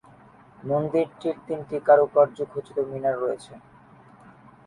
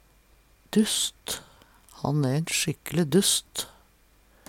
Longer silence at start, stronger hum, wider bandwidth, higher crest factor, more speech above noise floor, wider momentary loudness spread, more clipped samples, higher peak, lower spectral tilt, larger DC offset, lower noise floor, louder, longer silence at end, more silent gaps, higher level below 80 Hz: about the same, 0.65 s vs 0.7 s; neither; second, 11 kHz vs 18.5 kHz; about the same, 20 dB vs 18 dB; second, 28 dB vs 34 dB; about the same, 14 LU vs 13 LU; neither; first, -6 dBFS vs -10 dBFS; first, -7.5 dB/octave vs -4 dB/octave; neither; second, -52 dBFS vs -60 dBFS; about the same, -24 LUFS vs -26 LUFS; first, 1.1 s vs 0.8 s; neither; second, -66 dBFS vs -58 dBFS